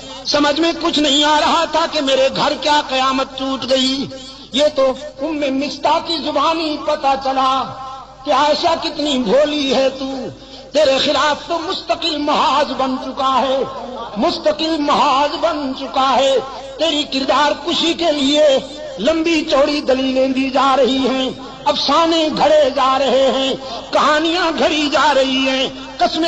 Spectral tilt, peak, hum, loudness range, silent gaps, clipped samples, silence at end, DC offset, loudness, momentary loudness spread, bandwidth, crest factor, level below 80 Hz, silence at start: -3 dB/octave; -4 dBFS; none; 3 LU; none; under 0.1%; 0 s; under 0.1%; -16 LUFS; 8 LU; 8.8 kHz; 12 dB; -46 dBFS; 0 s